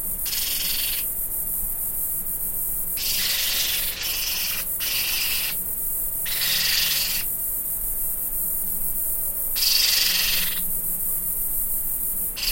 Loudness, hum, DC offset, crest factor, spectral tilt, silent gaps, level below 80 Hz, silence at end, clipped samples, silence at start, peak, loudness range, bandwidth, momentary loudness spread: -21 LUFS; none; under 0.1%; 18 dB; 1 dB/octave; none; -40 dBFS; 0 s; under 0.1%; 0 s; -6 dBFS; 2 LU; 16.5 kHz; 5 LU